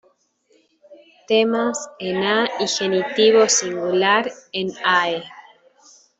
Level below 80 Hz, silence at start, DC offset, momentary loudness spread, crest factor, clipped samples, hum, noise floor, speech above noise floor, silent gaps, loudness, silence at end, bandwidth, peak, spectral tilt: -68 dBFS; 0.9 s; under 0.1%; 12 LU; 18 dB; under 0.1%; none; -61 dBFS; 42 dB; none; -19 LUFS; 0.8 s; 8.2 kHz; -4 dBFS; -2.5 dB/octave